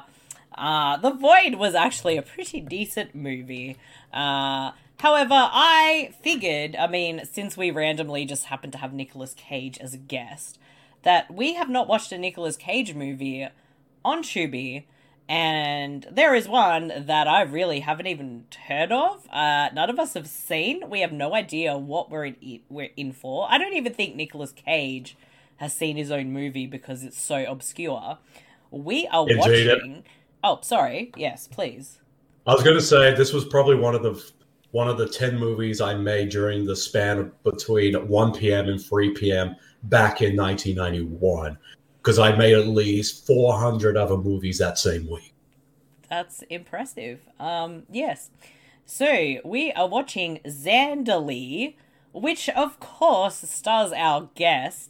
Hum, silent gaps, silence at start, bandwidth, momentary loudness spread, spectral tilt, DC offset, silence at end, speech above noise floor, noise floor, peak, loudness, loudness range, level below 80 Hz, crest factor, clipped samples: none; none; 0.3 s; 17 kHz; 17 LU; -4.5 dB/octave; under 0.1%; 0.05 s; 38 dB; -61 dBFS; -4 dBFS; -22 LUFS; 9 LU; -54 dBFS; 20 dB; under 0.1%